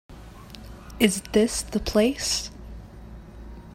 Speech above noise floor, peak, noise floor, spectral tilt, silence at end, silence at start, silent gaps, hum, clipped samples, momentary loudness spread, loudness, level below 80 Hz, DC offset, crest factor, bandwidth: 20 dB; -4 dBFS; -43 dBFS; -3.5 dB/octave; 0 s; 0.1 s; none; none; under 0.1%; 22 LU; -23 LUFS; -42 dBFS; under 0.1%; 24 dB; 16 kHz